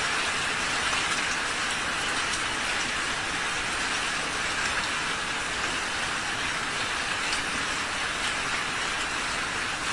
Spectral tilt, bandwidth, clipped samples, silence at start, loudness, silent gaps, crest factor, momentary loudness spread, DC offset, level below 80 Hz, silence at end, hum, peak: -1 dB/octave; 11.5 kHz; under 0.1%; 0 s; -27 LUFS; none; 16 dB; 2 LU; 0.2%; -50 dBFS; 0 s; none; -14 dBFS